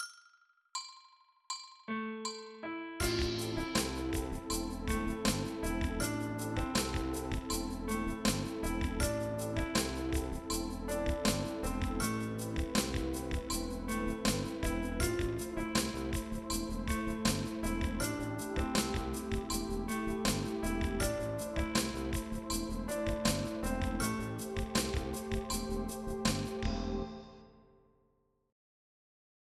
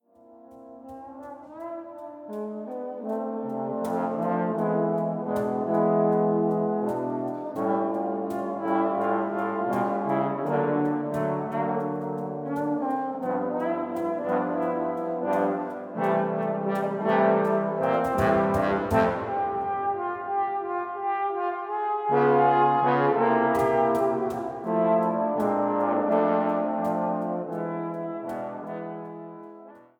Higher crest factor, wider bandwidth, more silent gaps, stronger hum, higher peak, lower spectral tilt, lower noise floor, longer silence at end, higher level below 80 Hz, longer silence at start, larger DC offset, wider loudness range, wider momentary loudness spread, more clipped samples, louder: about the same, 20 dB vs 18 dB; second, 15 kHz vs 19 kHz; neither; neither; second, -16 dBFS vs -8 dBFS; second, -4.5 dB/octave vs -8 dB/octave; first, -75 dBFS vs -52 dBFS; first, 1.9 s vs 0.2 s; first, -44 dBFS vs -58 dBFS; second, 0 s vs 0.3 s; neither; second, 2 LU vs 6 LU; second, 6 LU vs 13 LU; neither; second, -36 LUFS vs -26 LUFS